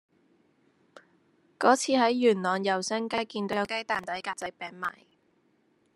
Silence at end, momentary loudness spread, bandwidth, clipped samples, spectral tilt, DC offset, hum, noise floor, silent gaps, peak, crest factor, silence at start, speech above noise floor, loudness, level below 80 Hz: 1.05 s; 13 LU; 12.5 kHz; under 0.1%; -3.5 dB/octave; under 0.1%; none; -68 dBFS; none; -6 dBFS; 24 dB; 1.6 s; 41 dB; -28 LUFS; -74 dBFS